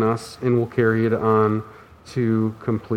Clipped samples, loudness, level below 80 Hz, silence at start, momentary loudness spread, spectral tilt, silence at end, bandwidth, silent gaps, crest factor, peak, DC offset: under 0.1%; -21 LUFS; -56 dBFS; 0 s; 9 LU; -8 dB/octave; 0 s; 12.5 kHz; none; 16 dB; -4 dBFS; under 0.1%